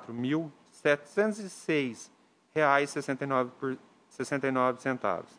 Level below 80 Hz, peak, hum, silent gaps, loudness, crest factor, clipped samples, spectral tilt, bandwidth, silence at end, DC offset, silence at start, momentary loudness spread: -78 dBFS; -8 dBFS; none; none; -30 LUFS; 22 dB; under 0.1%; -5.5 dB/octave; 10.5 kHz; 0.15 s; under 0.1%; 0 s; 11 LU